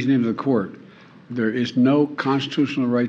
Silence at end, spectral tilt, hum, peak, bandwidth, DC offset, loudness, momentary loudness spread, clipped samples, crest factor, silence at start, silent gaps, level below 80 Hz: 0 s; -7 dB/octave; none; -8 dBFS; 7.4 kHz; under 0.1%; -21 LUFS; 7 LU; under 0.1%; 14 dB; 0 s; none; -68 dBFS